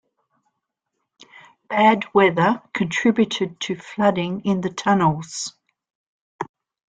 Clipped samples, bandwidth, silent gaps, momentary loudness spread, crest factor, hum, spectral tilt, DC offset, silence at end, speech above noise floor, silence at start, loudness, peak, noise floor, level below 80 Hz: under 0.1%; 9.4 kHz; 5.95-6.39 s; 14 LU; 20 dB; none; -5 dB/octave; under 0.1%; 0.45 s; 59 dB; 1.7 s; -20 LUFS; -2 dBFS; -79 dBFS; -60 dBFS